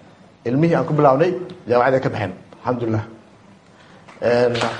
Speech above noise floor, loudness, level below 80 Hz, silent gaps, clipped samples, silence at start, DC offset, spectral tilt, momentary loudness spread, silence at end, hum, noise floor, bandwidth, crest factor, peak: 30 dB; -19 LUFS; -56 dBFS; none; under 0.1%; 0.45 s; under 0.1%; -7 dB/octave; 13 LU; 0 s; none; -48 dBFS; 9.8 kHz; 18 dB; -2 dBFS